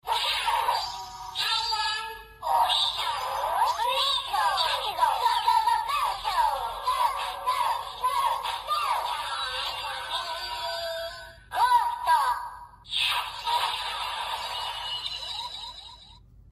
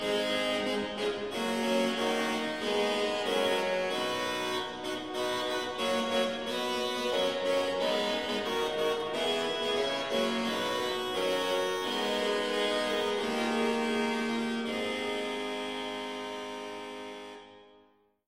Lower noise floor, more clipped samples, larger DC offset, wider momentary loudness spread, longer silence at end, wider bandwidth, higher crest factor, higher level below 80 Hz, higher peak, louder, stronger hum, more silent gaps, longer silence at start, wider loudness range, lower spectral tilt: second, -51 dBFS vs -65 dBFS; neither; second, under 0.1% vs 0.1%; first, 10 LU vs 7 LU; second, 0 s vs 0.5 s; about the same, 15 kHz vs 16 kHz; about the same, 16 dB vs 14 dB; first, -56 dBFS vs -66 dBFS; first, -12 dBFS vs -16 dBFS; first, -27 LUFS vs -31 LUFS; neither; neither; about the same, 0.05 s vs 0 s; about the same, 4 LU vs 3 LU; second, 0.5 dB/octave vs -3 dB/octave